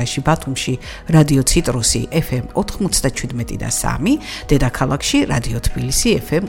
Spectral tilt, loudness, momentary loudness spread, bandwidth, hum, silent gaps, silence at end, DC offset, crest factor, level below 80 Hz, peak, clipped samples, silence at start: -4.5 dB/octave; -17 LUFS; 8 LU; 17 kHz; none; none; 0 s; under 0.1%; 16 dB; -28 dBFS; 0 dBFS; under 0.1%; 0 s